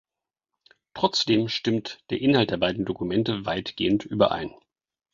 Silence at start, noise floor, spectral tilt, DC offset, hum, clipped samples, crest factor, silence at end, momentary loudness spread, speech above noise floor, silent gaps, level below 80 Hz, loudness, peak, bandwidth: 0.95 s; -89 dBFS; -5.5 dB/octave; under 0.1%; none; under 0.1%; 22 dB; 0.65 s; 9 LU; 65 dB; none; -56 dBFS; -25 LUFS; -4 dBFS; 7.6 kHz